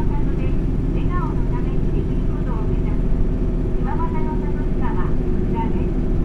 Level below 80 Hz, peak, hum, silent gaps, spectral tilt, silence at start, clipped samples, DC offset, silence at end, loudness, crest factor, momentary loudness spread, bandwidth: -20 dBFS; -6 dBFS; none; none; -10 dB/octave; 0 s; under 0.1%; under 0.1%; 0 s; -23 LUFS; 12 dB; 1 LU; 4 kHz